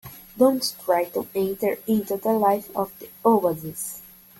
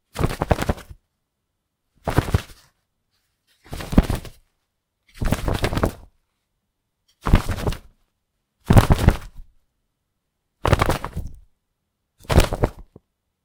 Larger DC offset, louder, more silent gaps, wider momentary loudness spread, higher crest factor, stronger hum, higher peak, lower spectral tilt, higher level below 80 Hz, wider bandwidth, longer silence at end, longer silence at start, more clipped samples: neither; about the same, -24 LUFS vs -22 LUFS; neither; second, 12 LU vs 15 LU; second, 18 dB vs 24 dB; neither; second, -6 dBFS vs 0 dBFS; about the same, -5 dB/octave vs -6 dB/octave; second, -62 dBFS vs -28 dBFS; about the same, 17 kHz vs 18 kHz; second, 0.35 s vs 0.6 s; about the same, 0.05 s vs 0.15 s; neither